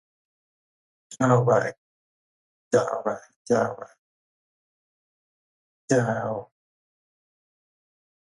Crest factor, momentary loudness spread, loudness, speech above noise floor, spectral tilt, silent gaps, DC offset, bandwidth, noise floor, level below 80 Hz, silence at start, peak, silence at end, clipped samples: 22 dB; 15 LU; -24 LUFS; over 67 dB; -6.5 dB/octave; 1.77-2.71 s, 3.36-3.45 s, 3.99-5.88 s; under 0.1%; 11.5 kHz; under -90 dBFS; -68 dBFS; 1.1 s; -6 dBFS; 1.85 s; under 0.1%